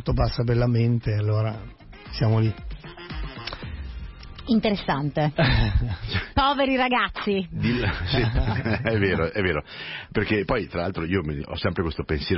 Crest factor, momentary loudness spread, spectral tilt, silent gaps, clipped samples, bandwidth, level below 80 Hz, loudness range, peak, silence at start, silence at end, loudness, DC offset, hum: 14 dB; 15 LU; -10.5 dB/octave; none; under 0.1%; 5.8 kHz; -34 dBFS; 4 LU; -10 dBFS; 0 s; 0 s; -24 LUFS; under 0.1%; none